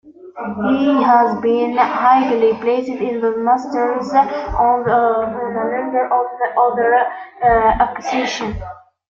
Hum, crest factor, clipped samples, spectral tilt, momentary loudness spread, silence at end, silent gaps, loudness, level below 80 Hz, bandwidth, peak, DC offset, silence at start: none; 14 dB; under 0.1%; -5.5 dB/octave; 9 LU; 0.4 s; none; -16 LUFS; -40 dBFS; 7.4 kHz; -2 dBFS; under 0.1%; 0.05 s